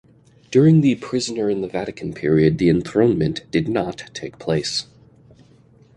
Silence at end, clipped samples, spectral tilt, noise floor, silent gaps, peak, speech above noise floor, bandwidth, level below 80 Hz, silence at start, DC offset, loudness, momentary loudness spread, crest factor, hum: 1.15 s; under 0.1%; -6.5 dB/octave; -51 dBFS; none; -4 dBFS; 33 dB; 10.5 kHz; -48 dBFS; 0.5 s; under 0.1%; -19 LUFS; 13 LU; 16 dB; none